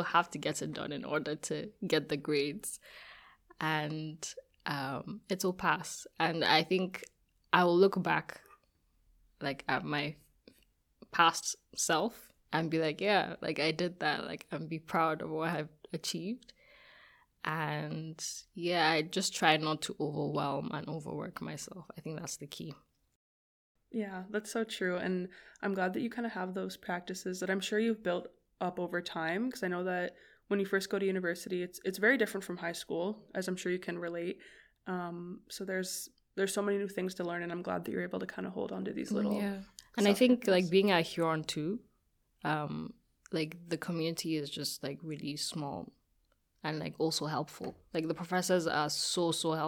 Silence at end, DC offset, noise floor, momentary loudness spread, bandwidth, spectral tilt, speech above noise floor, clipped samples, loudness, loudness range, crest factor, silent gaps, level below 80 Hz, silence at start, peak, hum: 0 s; under 0.1%; -75 dBFS; 14 LU; 19.5 kHz; -4 dB/octave; 41 dB; under 0.1%; -34 LUFS; 8 LU; 26 dB; 23.16-23.75 s; -72 dBFS; 0 s; -10 dBFS; none